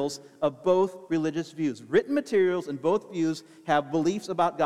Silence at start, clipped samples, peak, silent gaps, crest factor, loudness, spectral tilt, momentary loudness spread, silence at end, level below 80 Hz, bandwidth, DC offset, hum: 0 s; under 0.1%; -10 dBFS; none; 16 dB; -27 LUFS; -6 dB/octave; 6 LU; 0 s; -70 dBFS; 13 kHz; under 0.1%; none